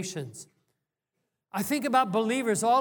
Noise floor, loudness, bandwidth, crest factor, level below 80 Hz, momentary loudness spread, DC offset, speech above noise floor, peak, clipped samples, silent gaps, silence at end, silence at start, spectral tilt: -83 dBFS; -27 LUFS; 19.5 kHz; 18 dB; -82 dBFS; 15 LU; under 0.1%; 56 dB; -10 dBFS; under 0.1%; none; 0 s; 0 s; -4 dB/octave